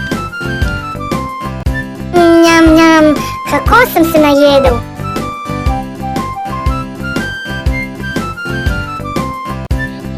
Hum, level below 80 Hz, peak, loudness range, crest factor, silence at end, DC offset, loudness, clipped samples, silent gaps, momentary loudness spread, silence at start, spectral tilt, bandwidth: none; -24 dBFS; 0 dBFS; 10 LU; 12 dB; 0 s; under 0.1%; -12 LUFS; 0.2%; none; 14 LU; 0 s; -5.5 dB/octave; 15.5 kHz